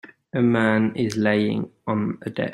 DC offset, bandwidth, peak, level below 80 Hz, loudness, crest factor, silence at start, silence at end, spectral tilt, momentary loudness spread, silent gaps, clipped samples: under 0.1%; 11 kHz; -6 dBFS; -62 dBFS; -22 LUFS; 18 dB; 0.05 s; 0 s; -7 dB/octave; 9 LU; none; under 0.1%